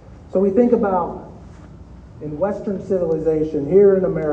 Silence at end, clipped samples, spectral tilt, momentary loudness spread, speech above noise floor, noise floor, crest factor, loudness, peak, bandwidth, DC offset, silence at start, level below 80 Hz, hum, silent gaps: 0 s; under 0.1%; -10 dB/octave; 17 LU; 22 dB; -40 dBFS; 16 dB; -18 LUFS; -2 dBFS; 6.4 kHz; under 0.1%; 0.1 s; -44 dBFS; none; none